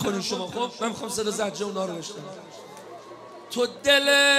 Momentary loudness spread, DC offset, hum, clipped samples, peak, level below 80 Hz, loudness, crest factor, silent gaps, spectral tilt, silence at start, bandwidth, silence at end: 23 LU; under 0.1%; none; under 0.1%; -6 dBFS; -64 dBFS; -25 LUFS; 20 dB; none; -2 dB/octave; 0 s; 15.5 kHz; 0 s